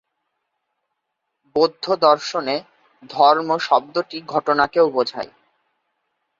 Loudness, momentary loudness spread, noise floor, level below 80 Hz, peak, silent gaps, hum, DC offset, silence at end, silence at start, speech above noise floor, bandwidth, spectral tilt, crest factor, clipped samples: -19 LUFS; 11 LU; -77 dBFS; -64 dBFS; -2 dBFS; none; none; under 0.1%; 1.15 s; 1.55 s; 59 dB; 7.6 kHz; -4.5 dB/octave; 20 dB; under 0.1%